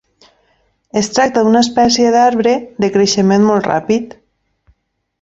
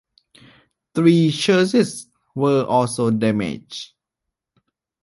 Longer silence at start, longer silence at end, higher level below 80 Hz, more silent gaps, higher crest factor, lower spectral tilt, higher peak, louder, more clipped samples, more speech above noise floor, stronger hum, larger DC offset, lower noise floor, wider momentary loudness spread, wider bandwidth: about the same, 0.95 s vs 0.95 s; about the same, 1.1 s vs 1.2 s; first, -50 dBFS vs -58 dBFS; neither; about the same, 14 dB vs 18 dB; second, -4.5 dB/octave vs -6 dB/octave; about the same, 0 dBFS vs -2 dBFS; first, -13 LUFS vs -18 LUFS; neither; second, 53 dB vs 65 dB; neither; neither; second, -65 dBFS vs -83 dBFS; second, 7 LU vs 18 LU; second, 8 kHz vs 11.5 kHz